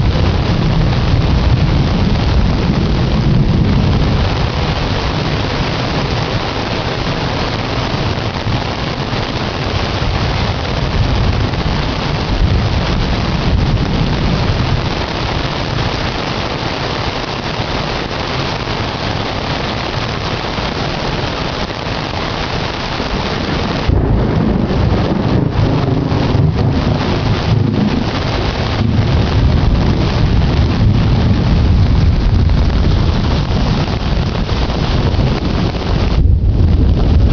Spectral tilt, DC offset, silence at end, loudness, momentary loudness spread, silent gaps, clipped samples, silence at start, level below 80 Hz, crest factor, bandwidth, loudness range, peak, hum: -6.5 dB/octave; under 0.1%; 0 s; -15 LUFS; 5 LU; none; under 0.1%; 0 s; -18 dBFS; 14 dB; 6.8 kHz; 5 LU; 0 dBFS; none